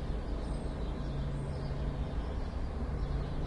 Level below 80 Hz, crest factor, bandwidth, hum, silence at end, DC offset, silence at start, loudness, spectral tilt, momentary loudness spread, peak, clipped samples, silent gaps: -38 dBFS; 12 dB; 10.5 kHz; none; 0 s; under 0.1%; 0 s; -38 LUFS; -8 dB/octave; 2 LU; -22 dBFS; under 0.1%; none